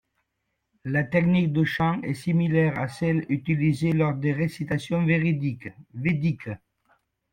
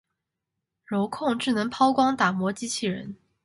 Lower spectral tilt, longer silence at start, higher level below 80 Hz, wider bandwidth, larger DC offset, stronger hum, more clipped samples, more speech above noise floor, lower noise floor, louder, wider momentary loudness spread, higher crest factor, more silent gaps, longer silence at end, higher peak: first, -8 dB/octave vs -4.5 dB/octave; about the same, 0.85 s vs 0.9 s; first, -54 dBFS vs -66 dBFS; second, 10 kHz vs 11.5 kHz; neither; neither; neither; second, 54 dB vs 59 dB; second, -78 dBFS vs -84 dBFS; about the same, -25 LUFS vs -25 LUFS; about the same, 9 LU vs 10 LU; about the same, 16 dB vs 20 dB; neither; first, 0.75 s vs 0.3 s; about the same, -10 dBFS vs -8 dBFS